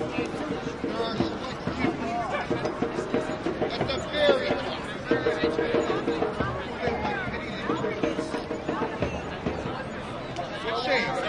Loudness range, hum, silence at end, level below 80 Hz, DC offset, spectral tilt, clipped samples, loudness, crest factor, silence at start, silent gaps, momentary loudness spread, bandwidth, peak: 4 LU; none; 0 s; -48 dBFS; under 0.1%; -5.5 dB/octave; under 0.1%; -28 LUFS; 22 dB; 0 s; none; 7 LU; 11.5 kHz; -8 dBFS